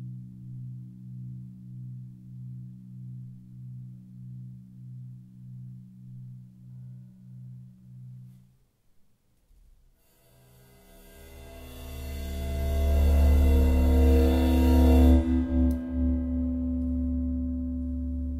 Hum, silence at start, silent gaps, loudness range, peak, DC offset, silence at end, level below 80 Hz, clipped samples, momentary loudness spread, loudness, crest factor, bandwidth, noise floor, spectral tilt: none; 0 s; none; 24 LU; -8 dBFS; under 0.1%; 0 s; -30 dBFS; under 0.1%; 25 LU; -25 LUFS; 18 dB; 15 kHz; -64 dBFS; -8.5 dB/octave